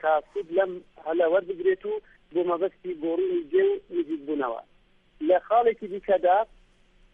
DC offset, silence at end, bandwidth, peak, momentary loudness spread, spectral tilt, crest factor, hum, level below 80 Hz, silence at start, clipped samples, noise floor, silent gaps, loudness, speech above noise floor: under 0.1%; 0.7 s; 3.8 kHz; -10 dBFS; 10 LU; -7.5 dB/octave; 16 dB; none; -62 dBFS; 0.05 s; under 0.1%; -59 dBFS; none; -26 LUFS; 33 dB